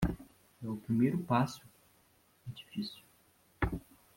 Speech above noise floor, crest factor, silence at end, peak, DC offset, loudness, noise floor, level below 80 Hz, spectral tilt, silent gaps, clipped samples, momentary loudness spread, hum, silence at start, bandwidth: 35 dB; 22 dB; 0.35 s; -16 dBFS; under 0.1%; -35 LUFS; -68 dBFS; -50 dBFS; -7 dB/octave; none; under 0.1%; 19 LU; none; 0 s; 16.5 kHz